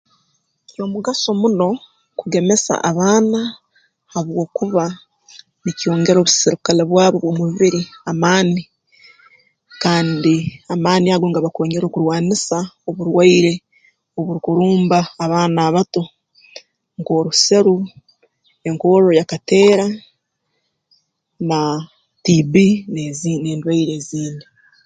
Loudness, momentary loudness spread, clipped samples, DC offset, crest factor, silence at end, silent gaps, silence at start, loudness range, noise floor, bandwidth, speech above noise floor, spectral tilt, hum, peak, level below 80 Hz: -16 LUFS; 14 LU; under 0.1%; under 0.1%; 16 dB; 0.45 s; none; 0.8 s; 3 LU; -71 dBFS; 9.4 kHz; 55 dB; -5 dB/octave; none; 0 dBFS; -58 dBFS